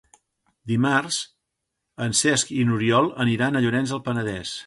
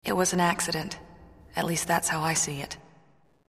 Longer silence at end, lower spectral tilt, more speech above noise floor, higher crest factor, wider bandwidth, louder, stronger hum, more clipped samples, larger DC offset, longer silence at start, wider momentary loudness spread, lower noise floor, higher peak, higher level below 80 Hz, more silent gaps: second, 0.05 s vs 0.7 s; about the same, -4 dB/octave vs -3 dB/octave; first, 58 dB vs 35 dB; about the same, 18 dB vs 22 dB; second, 11.5 kHz vs 15.5 kHz; first, -22 LUFS vs -27 LUFS; neither; neither; neither; first, 0.65 s vs 0.05 s; second, 9 LU vs 15 LU; first, -80 dBFS vs -62 dBFS; about the same, -6 dBFS vs -8 dBFS; about the same, -56 dBFS vs -56 dBFS; neither